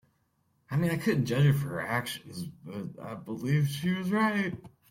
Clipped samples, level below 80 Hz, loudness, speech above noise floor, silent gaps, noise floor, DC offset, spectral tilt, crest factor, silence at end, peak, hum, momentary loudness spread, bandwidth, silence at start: under 0.1%; -64 dBFS; -29 LUFS; 43 dB; none; -72 dBFS; under 0.1%; -6.5 dB/octave; 16 dB; 0.2 s; -14 dBFS; none; 15 LU; 16.5 kHz; 0.7 s